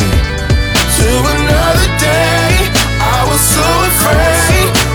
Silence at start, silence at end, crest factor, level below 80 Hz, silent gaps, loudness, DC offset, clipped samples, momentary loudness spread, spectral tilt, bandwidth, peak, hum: 0 s; 0 s; 10 dB; -16 dBFS; none; -10 LUFS; under 0.1%; under 0.1%; 3 LU; -3.5 dB/octave; over 20 kHz; 0 dBFS; none